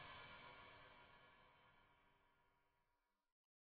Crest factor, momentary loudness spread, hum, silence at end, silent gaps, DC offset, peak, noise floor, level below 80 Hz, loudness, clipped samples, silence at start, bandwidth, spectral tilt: 20 dB; 9 LU; none; 0.6 s; none; under 0.1%; -46 dBFS; -89 dBFS; -82 dBFS; -62 LUFS; under 0.1%; 0 s; 4.8 kHz; -1 dB/octave